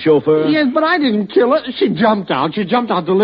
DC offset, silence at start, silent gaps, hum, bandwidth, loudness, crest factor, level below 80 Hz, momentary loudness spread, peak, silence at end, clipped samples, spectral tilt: under 0.1%; 0 s; none; none; 5.4 kHz; -15 LUFS; 12 dB; -56 dBFS; 4 LU; -2 dBFS; 0 s; under 0.1%; -4 dB/octave